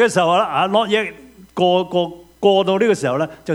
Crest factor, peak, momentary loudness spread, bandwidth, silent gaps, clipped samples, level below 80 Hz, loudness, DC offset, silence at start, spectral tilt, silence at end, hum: 16 dB; 0 dBFS; 8 LU; 15.5 kHz; none; under 0.1%; -56 dBFS; -17 LUFS; under 0.1%; 0 s; -5 dB/octave; 0 s; none